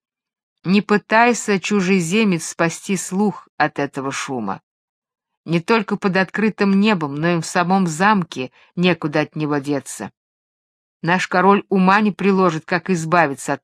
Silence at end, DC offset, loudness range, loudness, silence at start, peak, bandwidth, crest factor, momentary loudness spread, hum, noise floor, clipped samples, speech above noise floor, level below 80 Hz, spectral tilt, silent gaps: 0.05 s; under 0.1%; 4 LU; -18 LUFS; 0.65 s; 0 dBFS; 14 kHz; 18 dB; 10 LU; none; under -90 dBFS; under 0.1%; over 72 dB; -64 dBFS; -5.5 dB/octave; 3.49-3.58 s, 4.63-5.02 s, 5.37-5.43 s, 10.17-11.00 s